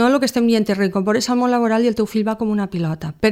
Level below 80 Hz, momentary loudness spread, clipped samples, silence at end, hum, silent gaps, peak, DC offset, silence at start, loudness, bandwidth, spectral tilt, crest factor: -50 dBFS; 5 LU; under 0.1%; 0 s; none; none; -2 dBFS; under 0.1%; 0 s; -18 LUFS; 16 kHz; -5.5 dB/octave; 16 dB